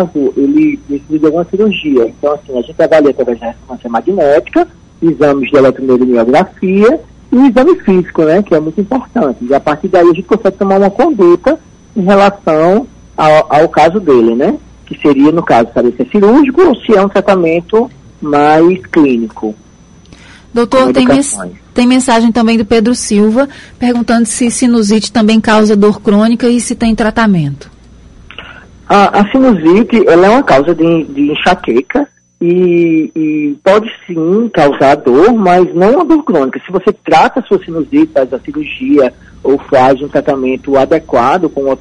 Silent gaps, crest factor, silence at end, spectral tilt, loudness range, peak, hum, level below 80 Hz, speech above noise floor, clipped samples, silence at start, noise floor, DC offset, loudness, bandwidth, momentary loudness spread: none; 10 dB; 0.05 s; -5.5 dB/octave; 3 LU; 0 dBFS; none; -38 dBFS; 31 dB; under 0.1%; 0 s; -39 dBFS; under 0.1%; -9 LUFS; 11.5 kHz; 9 LU